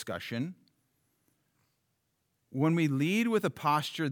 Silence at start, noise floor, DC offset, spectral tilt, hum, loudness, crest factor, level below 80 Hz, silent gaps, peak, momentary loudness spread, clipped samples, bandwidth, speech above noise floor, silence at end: 0 s; -79 dBFS; under 0.1%; -6 dB/octave; none; -30 LUFS; 16 dB; -80 dBFS; none; -16 dBFS; 10 LU; under 0.1%; 19.5 kHz; 49 dB; 0 s